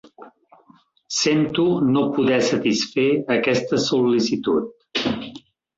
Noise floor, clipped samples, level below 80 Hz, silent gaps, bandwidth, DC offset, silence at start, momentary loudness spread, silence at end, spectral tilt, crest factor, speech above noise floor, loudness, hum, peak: -55 dBFS; under 0.1%; -58 dBFS; none; 7.8 kHz; under 0.1%; 0.2 s; 7 LU; 0.4 s; -4.5 dB/octave; 14 dB; 36 dB; -20 LUFS; none; -8 dBFS